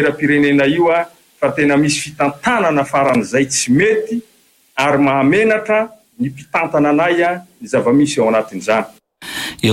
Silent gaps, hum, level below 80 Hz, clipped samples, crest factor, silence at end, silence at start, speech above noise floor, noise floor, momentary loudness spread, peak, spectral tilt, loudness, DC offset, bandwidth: none; none; -52 dBFS; under 0.1%; 12 dB; 0 s; 0 s; 21 dB; -35 dBFS; 11 LU; -4 dBFS; -4.5 dB/octave; -15 LUFS; under 0.1%; 14.5 kHz